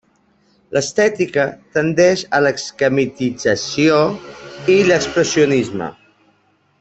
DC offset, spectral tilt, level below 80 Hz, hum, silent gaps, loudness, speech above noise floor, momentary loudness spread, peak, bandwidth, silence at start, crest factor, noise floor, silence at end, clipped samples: under 0.1%; -4.5 dB/octave; -54 dBFS; none; none; -16 LUFS; 43 dB; 9 LU; -2 dBFS; 8.4 kHz; 0.7 s; 14 dB; -59 dBFS; 0.9 s; under 0.1%